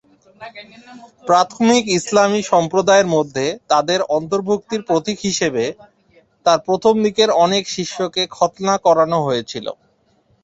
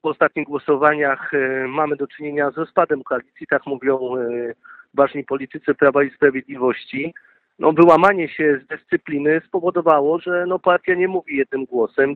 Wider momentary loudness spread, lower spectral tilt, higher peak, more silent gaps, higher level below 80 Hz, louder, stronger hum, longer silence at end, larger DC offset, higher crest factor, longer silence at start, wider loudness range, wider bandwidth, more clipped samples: about the same, 9 LU vs 9 LU; second, -4 dB/octave vs -8 dB/octave; about the same, -2 dBFS vs 0 dBFS; neither; about the same, -58 dBFS vs -62 dBFS; about the same, -17 LUFS vs -19 LUFS; neither; first, 0.7 s vs 0 s; neither; about the same, 16 dB vs 18 dB; first, 0.4 s vs 0.05 s; about the same, 3 LU vs 5 LU; first, 8.4 kHz vs 5 kHz; neither